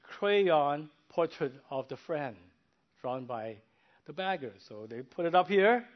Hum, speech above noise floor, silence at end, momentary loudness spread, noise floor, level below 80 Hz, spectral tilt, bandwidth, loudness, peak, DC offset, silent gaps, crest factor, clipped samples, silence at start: none; 41 dB; 0.1 s; 18 LU; -72 dBFS; -80 dBFS; -7 dB/octave; 6.2 kHz; -31 LUFS; -12 dBFS; under 0.1%; none; 20 dB; under 0.1%; 0.1 s